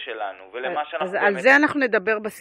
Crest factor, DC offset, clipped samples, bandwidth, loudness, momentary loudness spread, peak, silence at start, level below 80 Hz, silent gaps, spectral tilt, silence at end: 18 dB; under 0.1%; under 0.1%; 15 kHz; -20 LUFS; 15 LU; -4 dBFS; 0 s; -72 dBFS; none; -4.5 dB/octave; 0 s